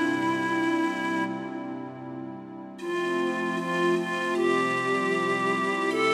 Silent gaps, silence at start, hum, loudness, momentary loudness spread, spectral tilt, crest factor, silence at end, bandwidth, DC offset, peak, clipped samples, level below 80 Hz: none; 0 s; none; -27 LUFS; 13 LU; -5 dB/octave; 16 dB; 0 s; 13.5 kHz; under 0.1%; -12 dBFS; under 0.1%; -82 dBFS